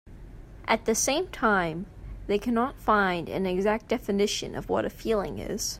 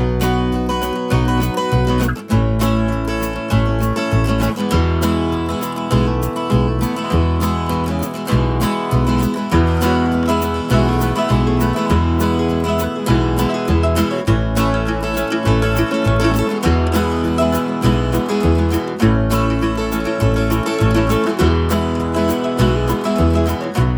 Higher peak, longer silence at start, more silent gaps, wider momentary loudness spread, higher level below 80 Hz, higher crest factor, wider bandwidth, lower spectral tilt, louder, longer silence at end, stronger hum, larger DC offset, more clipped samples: second, -8 dBFS vs -2 dBFS; about the same, 0.05 s vs 0 s; neither; first, 8 LU vs 4 LU; second, -46 dBFS vs -24 dBFS; about the same, 18 dB vs 14 dB; second, 16 kHz vs over 20 kHz; second, -3.5 dB/octave vs -6.5 dB/octave; second, -27 LUFS vs -17 LUFS; about the same, 0 s vs 0 s; neither; neither; neither